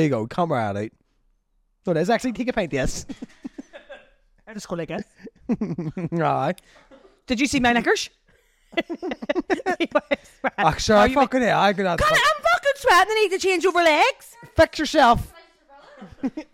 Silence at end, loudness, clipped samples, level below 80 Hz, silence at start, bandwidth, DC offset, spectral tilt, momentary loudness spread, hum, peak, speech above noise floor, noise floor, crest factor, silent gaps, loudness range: 0.1 s; -21 LUFS; under 0.1%; -44 dBFS; 0 s; 16.5 kHz; under 0.1%; -4.5 dB/octave; 16 LU; none; -6 dBFS; 45 dB; -67 dBFS; 16 dB; none; 10 LU